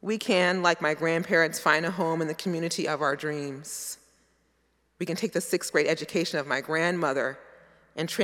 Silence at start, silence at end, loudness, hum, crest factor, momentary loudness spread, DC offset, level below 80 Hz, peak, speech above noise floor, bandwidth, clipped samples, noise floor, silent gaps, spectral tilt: 0.05 s; 0 s; -27 LUFS; none; 22 dB; 12 LU; under 0.1%; -74 dBFS; -6 dBFS; 43 dB; 17 kHz; under 0.1%; -70 dBFS; none; -4 dB/octave